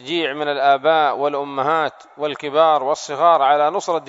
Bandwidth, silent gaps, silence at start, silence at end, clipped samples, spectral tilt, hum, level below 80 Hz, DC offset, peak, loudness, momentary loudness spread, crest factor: 7.8 kHz; none; 0 s; 0.05 s; under 0.1%; -3.5 dB/octave; none; -74 dBFS; under 0.1%; -2 dBFS; -18 LUFS; 9 LU; 16 dB